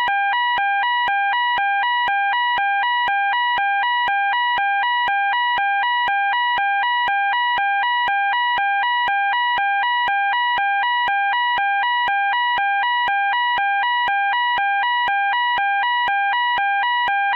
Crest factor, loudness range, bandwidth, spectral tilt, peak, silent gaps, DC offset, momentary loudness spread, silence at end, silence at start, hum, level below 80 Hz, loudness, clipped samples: 6 dB; 0 LU; 5.2 kHz; -2 dB/octave; -12 dBFS; none; under 0.1%; 0 LU; 0 s; 0 s; none; -62 dBFS; -18 LUFS; under 0.1%